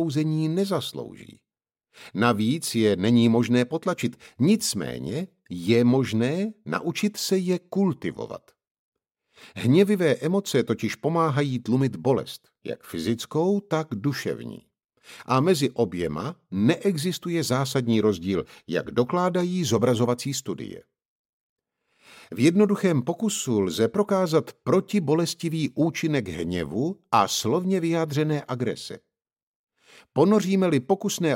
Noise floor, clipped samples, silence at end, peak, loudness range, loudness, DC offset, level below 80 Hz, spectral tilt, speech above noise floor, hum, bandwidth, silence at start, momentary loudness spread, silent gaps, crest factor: -79 dBFS; under 0.1%; 0 s; -6 dBFS; 3 LU; -24 LUFS; under 0.1%; -62 dBFS; -5.5 dB/octave; 56 dB; none; 16.5 kHz; 0 s; 12 LU; 8.71-8.92 s, 21.05-21.56 s, 29.43-29.67 s; 20 dB